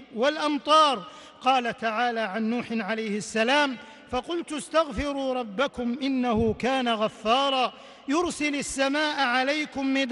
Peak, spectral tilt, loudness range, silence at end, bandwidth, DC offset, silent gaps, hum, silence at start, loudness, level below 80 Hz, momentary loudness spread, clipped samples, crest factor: -8 dBFS; -3.5 dB/octave; 2 LU; 0 s; 11.5 kHz; under 0.1%; none; none; 0 s; -25 LUFS; -52 dBFS; 8 LU; under 0.1%; 16 dB